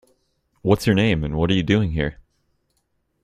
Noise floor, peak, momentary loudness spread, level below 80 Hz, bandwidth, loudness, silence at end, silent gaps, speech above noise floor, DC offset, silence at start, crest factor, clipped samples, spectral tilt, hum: -70 dBFS; -2 dBFS; 9 LU; -40 dBFS; 15.5 kHz; -20 LUFS; 1.1 s; none; 51 dB; under 0.1%; 0.65 s; 20 dB; under 0.1%; -6.5 dB/octave; none